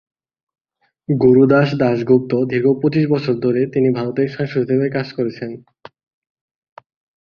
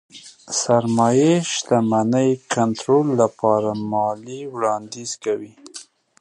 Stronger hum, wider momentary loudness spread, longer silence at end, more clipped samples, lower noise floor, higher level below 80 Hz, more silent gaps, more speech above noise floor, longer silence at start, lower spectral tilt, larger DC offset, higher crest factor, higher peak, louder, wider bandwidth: neither; second, 11 LU vs 14 LU; first, 1.65 s vs 0.4 s; neither; first, -67 dBFS vs -42 dBFS; first, -56 dBFS vs -64 dBFS; neither; first, 51 dB vs 23 dB; first, 1.1 s vs 0.15 s; first, -9.5 dB/octave vs -5 dB/octave; neither; about the same, 16 dB vs 18 dB; about the same, -2 dBFS vs -2 dBFS; first, -16 LUFS vs -20 LUFS; second, 6.4 kHz vs 11.5 kHz